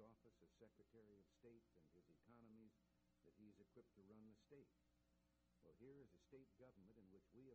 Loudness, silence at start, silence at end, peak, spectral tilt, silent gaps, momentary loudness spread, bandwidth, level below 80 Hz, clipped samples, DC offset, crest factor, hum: -69 LUFS; 0 s; 0 s; -54 dBFS; -7 dB/octave; none; 2 LU; 6.8 kHz; -88 dBFS; under 0.1%; under 0.1%; 16 dB; none